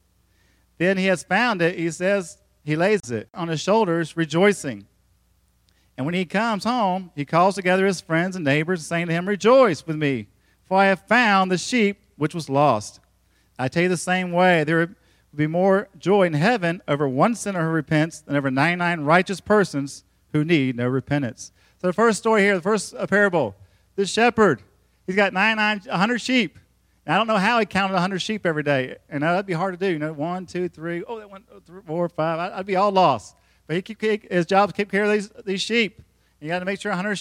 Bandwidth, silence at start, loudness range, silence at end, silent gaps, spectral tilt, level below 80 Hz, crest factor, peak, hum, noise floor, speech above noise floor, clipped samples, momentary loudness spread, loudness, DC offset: 14.5 kHz; 0.8 s; 4 LU; 0 s; none; -5.5 dB/octave; -62 dBFS; 20 dB; -2 dBFS; none; -63 dBFS; 42 dB; under 0.1%; 11 LU; -21 LUFS; under 0.1%